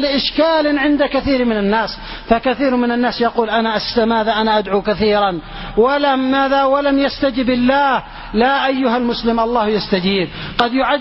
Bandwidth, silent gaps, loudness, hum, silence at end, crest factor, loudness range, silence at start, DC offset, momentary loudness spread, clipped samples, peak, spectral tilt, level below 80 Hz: 5.8 kHz; none; -16 LUFS; none; 0 s; 16 dB; 1 LU; 0 s; under 0.1%; 4 LU; under 0.1%; 0 dBFS; -7.5 dB/octave; -38 dBFS